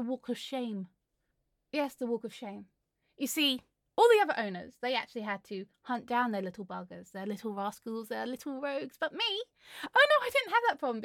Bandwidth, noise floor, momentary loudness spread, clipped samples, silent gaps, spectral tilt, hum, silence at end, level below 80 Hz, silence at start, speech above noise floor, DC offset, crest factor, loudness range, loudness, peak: 17.5 kHz; -81 dBFS; 18 LU; under 0.1%; none; -3.5 dB/octave; none; 0 s; -80 dBFS; 0 s; 48 dB; under 0.1%; 20 dB; 7 LU; -31 LUFS; -12 dBFS